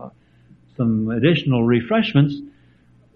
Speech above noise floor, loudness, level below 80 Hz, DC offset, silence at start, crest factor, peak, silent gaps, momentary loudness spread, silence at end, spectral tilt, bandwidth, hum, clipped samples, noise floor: 36 dB; -19 LUFS; -52 dBFS; under 0.1%; 0 s; 16 dB; -4 dBFS; none; 5 LU; 0.65 s; -9.5 dB/octave; 5.6 kHz; none; under 0.1%; -53 dBFS